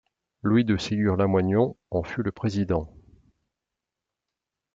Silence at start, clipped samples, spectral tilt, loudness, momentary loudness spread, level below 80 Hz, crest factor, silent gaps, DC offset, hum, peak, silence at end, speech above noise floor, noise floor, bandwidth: 0.45 s; under 0.1%; -7.5 dB/octave; -25 LUFS; 8 LU; -52 dBFS; 18 dB; none; under 0.1%; none; -10 dBFS; 1.85 s; 63 dB; -87 dBFS; 7.8 kHz